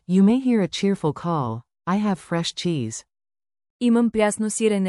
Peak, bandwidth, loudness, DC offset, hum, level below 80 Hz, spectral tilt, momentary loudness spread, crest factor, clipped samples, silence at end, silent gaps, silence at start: -8 dBFS; 12 kHz; -22 LUFS; under 0.1%; none; -58 dBFS; -5.5 dB/octave; 10 LU; 14 dB; under 0.1%; 0 s; 3.70-3.80 s; 0.1 s